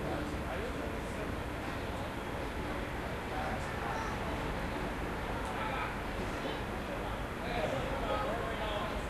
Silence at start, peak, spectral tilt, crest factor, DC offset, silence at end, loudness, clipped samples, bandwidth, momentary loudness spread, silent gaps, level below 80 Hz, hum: 0 s; -22 dBFS; -5.5 dB/octave; 14 dB; under 0.1%; 0 s; -37 LUFS; under 0.1%; 13 kHz; 4 LU; none; -44 dBFS; none